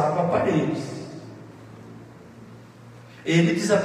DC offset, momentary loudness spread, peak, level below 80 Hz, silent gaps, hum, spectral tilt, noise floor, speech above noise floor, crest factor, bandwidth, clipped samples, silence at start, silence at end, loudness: under 0.1%; 25 LU; -8 dBFS; -64 dBFS; none; none; -6 dB/octave; -45 dBFS; 24 dB; 18 dB; 12 kHz; under 0.1%; 0 s; 0 s; -23 LUFS